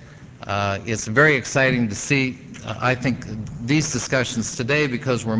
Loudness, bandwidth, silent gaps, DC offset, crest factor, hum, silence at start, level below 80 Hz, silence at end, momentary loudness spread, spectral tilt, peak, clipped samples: -21 LUFS; 8 kHz; none; under 0.1%; 20 dB; none; 0 s; -48 dBFS; 0 s; 13 LU; -4.5 dB/octave; -2 dBFS; under 0.1%